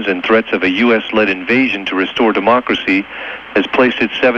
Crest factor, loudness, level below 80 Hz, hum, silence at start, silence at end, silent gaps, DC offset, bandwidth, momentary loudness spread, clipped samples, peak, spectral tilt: 14 dB; -14 LUFS; -50 dBFS; none; 0 s; 0 s; none; under 0.1%; 7.2 kHz; 5 LU; under 0.1%; 0 dBFS; -5.5 dB/octave